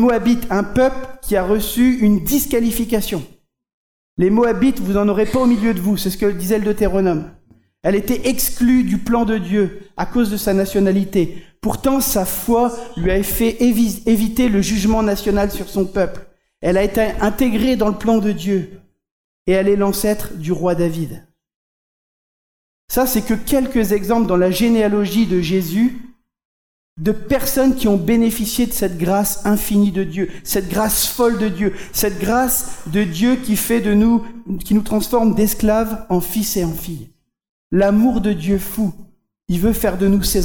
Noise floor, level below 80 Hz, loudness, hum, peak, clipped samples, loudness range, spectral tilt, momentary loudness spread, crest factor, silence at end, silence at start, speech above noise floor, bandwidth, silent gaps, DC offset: under -90 dBFS; -34 dBFS; -17 LUFS; none; -6 dBFS; under 0.1%; 3 LU; -5.5 dB/octave; 7 LU; 12 dB; 0 s; 0 s; over 74 dB; over 20 kHz; 3.74-4.17 s, 19.11-19.46 s, 21.54-22.88 s, 26.45-26.96 s, 37.49-37.70 s; under 0.1%